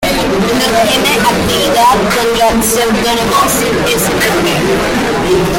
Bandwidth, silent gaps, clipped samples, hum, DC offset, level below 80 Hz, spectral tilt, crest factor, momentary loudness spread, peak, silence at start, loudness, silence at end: 16.5 kHz; none; under 0.1%; none; under 0.1%; -30 dBFS; -3.5 dB/octave; 10 dB; 3 LU; 0 dBFS; 0 s; -10 LUFS; 0 s